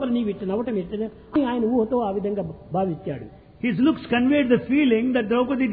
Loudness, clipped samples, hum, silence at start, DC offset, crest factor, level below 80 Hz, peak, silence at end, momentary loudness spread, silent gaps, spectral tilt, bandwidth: -23 LUFS; under 0.1%; none; 0 s; under 0.1%; 16 dB; -52 dBFS; -6 dBFS; 0 s; 10 LU; none; -10.5 dB/octave; 4.7 kHz